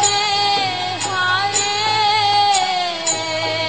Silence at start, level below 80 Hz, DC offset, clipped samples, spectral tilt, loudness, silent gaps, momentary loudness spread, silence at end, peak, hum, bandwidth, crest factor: 0 s; -58 dBFS; 0.5%; under 0.1%; -0.5 dB/octave; -16 LUFS; none; 5 LU; 0 s; -4 dBFS; none; 8.8 kHz; 14 dB